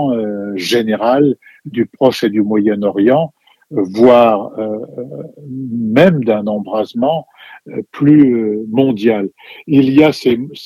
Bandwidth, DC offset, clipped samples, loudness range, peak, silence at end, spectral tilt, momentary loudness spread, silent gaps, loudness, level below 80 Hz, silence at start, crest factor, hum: 14 kHz; under 0.1%; 0.2%; 3 LU; 0 dBFS; 0 s; -7 dB/octave; 16 LU; none; -13 LUFS; -58 dBFS; 0 s; 14 dB; none